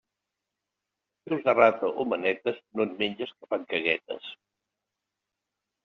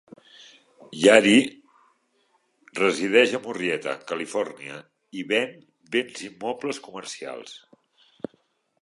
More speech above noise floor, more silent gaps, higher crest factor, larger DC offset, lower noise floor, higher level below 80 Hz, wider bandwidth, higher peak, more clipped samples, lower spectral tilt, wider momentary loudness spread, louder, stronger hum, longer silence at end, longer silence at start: first, 59 dB vs 45 dB; neither; about the same, 22 dB vs 24 dB; neither; first, -86 dBFS vs -68 dBFS; about the same, -74 dBFS vs -72 dBFS; second, 6.4 kHz vs 11.5 kHz; second, -6 dBFS vs -2 dBFS; neither; second, -2 dB/octave vs -3.5 dB/octave; second, 15 LU vs 23 LU; second, -27 LUFS vs -23 LUFS; first, 50 Hz at -65 dBFS vs none; first, 1.5 s vs 1.25 s; first, 1.25 s vs 0.9 s